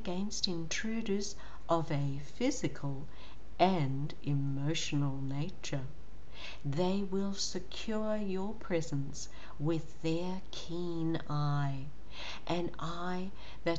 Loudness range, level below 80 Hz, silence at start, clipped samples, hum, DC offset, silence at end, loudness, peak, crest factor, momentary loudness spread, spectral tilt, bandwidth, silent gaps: 3 LU; -54 dBFS; 0 s; under 0.1%; none; 2%; 0 s; -36 LUFS; -14 dBFS; 22 dB; 12 LU; -5.5 dB/octave; 8.2 kHz; none